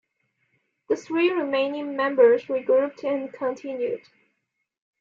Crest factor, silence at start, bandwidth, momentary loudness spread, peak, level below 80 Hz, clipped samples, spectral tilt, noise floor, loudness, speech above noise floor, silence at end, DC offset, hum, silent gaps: 18 dB; 0.9 s; 7.2 kHz; 11 LU; -6 dBFS; -76 dBFS; under 0.1%; -5 dB/octave; -78 dBFS; -24 LUFS; 55 dB; 1.05 s; under 0.1%; none; none